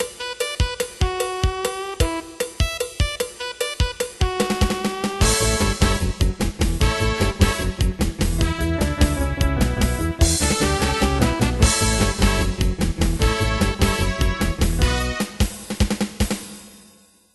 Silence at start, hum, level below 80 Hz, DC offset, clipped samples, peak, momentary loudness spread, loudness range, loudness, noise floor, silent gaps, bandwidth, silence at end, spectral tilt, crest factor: 0 s; none; -24 dBFS; under 0.1%; under 0.1%; -2 dBFS; 7 LU; 5 LU; -21 LUFS; -52 dBFS; none; 12.5 kHz; 0.55 s; -4.5 dB/octave; 18 dB